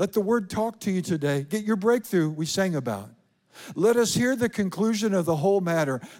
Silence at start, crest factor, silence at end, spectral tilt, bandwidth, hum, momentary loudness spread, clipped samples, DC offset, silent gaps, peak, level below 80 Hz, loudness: 0 s; 14 dB; 0 s; -5.5 dB/octave; 17 kHz; none; 6 LU; under 0.1%; under 0.1%; none; -10 dBFS; -62 dBFS; -25 LUFS